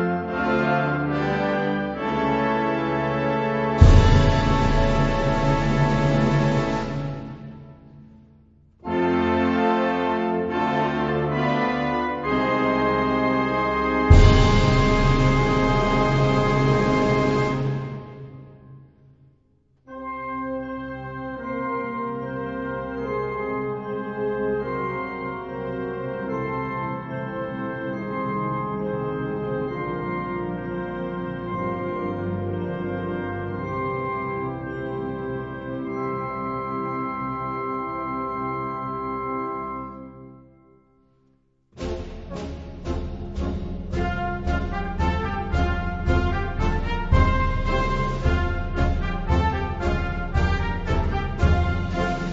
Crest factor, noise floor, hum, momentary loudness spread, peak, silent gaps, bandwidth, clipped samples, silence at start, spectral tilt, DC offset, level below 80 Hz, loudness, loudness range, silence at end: 22 dB; -63 dBFS; none; 11 LU; 0 dBFS; none; 7.8 kHz; under 0.1%; 0 s; -7.5 dB/octave; under 0.1%; -30 dBFS; -24 LUFS; 12 LU; 0 s